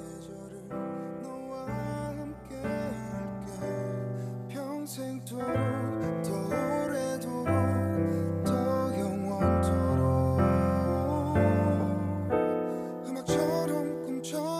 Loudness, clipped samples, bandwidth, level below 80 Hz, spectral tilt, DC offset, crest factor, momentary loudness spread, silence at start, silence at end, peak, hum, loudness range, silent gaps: -30 LUFS; under 0.1%; 15.5 kHz; -48 dBFS; -7.5 dB/octave; under 0.1%; 18 dB; 12 LU; 0 s; 0 s; -12 dBFS; none; 9 LU; none